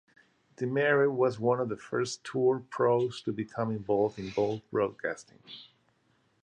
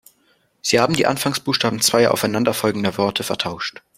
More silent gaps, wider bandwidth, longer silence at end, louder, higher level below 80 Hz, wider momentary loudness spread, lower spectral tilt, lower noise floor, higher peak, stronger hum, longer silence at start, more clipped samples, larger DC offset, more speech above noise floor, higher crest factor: neither; second, 9.8 kHz vs 16 kHz; first, 0.8 s vs 0.3 s; second, -30 LUFS vs -19 LUFS; second, -68 dBFS vs -56 dBFS; first, 11 LU vs 8 LU; first, -6 dB/octave vs -3.5 dB/octave; first, -70 dBFS vs -61 dBFS; second, -14 dBFS vs -2 dBFS; neither; about the same, 0.6 s vs 0.65 s; neither; neither; about the same, 41 dB vs 42 dB; about the same, 16 dB vs 18 dB